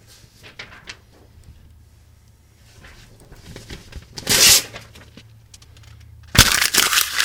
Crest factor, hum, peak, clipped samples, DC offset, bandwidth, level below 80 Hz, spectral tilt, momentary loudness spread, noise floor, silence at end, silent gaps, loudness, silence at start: 22 dB; none; 0 dBFS; under 0.1%; under 0.1%; 19 kHz; -38 dBFS; -0.5 dB/octave; 28 LU; -51 dBFS; 0 s; none; -13 LUFS; 0.6 s